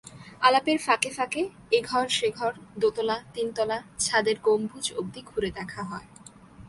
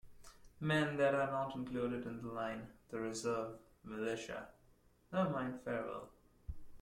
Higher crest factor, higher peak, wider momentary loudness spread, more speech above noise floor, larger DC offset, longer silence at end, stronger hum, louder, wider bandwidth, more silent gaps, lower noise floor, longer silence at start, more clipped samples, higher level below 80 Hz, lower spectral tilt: about the same, 22 dB vs 18 dB; first, -6 dBFS vs -22 dBFS; second, 11 LU vs 20 LU; second, 22 dB vs 30 dB; neither; about the same, 0 s vs 0 s; neither; first, -26 LUFS vs -40 LUFS; second, 11.5 kHz vs 16 kHz; neither; second, -49 dBFS vs -69 dBFS; about the same, 0.05 s vs 0.05 s; neither; about the same, -58 dBFS vs -62 dBFS; second, -3 dB/octave vs -5.5 dB/octave